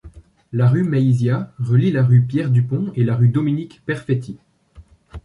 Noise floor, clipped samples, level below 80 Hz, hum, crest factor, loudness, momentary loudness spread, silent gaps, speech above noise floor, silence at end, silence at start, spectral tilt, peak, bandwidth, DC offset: -47 dBFS; under 0.1%; -48 dBFS; none; 14 dB; -18 LUFS; 10 LU; none; 30 dB; 0.05 s; 0.05 s; -9.5 dB/octave; -4 dBFS; 4.7 kHz; under 0.1%